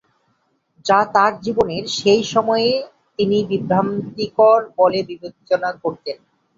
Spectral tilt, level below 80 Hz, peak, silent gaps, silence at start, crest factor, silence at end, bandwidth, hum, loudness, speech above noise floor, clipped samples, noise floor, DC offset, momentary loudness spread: -5 dB/octave; -56 dBFS; 0 dBFS; none; 0.85 s; 18 dB; 0.4 s; 7.8 kHz; none; -18 LUFS; 48 dB; under 0.1%; -66 dBFS; under 0.1%; 15 LU